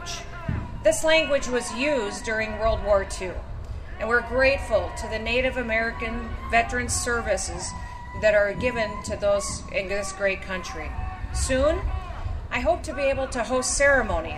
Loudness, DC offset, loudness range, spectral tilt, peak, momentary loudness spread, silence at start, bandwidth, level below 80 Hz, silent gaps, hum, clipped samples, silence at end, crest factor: -25 LUFS; under 0.1%; 3 LU; -3.5 dB/octave; -8 dBFS; 13 LU; 0 s; 14.5 kHz; -36 dBFS; none; none; under 0.1%; 0 s; 18 dB